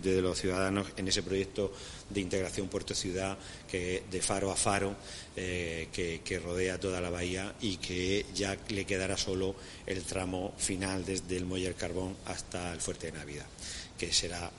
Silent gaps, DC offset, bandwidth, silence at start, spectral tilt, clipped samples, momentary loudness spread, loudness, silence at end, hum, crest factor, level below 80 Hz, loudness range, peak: none; under 0.1%; 11.5 kHz; 0 s; -3.5 dB/octave; under 0.1%; 9 LU; -34 LUFS; 0 s; none; 22 dB; -52 dBFS; 2 LU; -14 dBFS